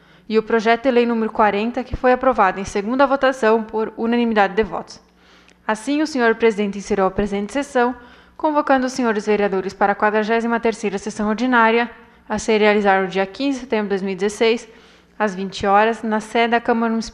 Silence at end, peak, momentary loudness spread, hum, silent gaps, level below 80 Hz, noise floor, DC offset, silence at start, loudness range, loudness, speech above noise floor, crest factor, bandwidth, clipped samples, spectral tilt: 0.05 s; -2 dBFS; 8 LU; none; none; -44 dBFS; -50 dBFS; under 0.1%; 0.3 s; 3 LU; -19 LUFS; 32 dB; 16 dB; 11 kHz; under 0.1%; -5 dB/octave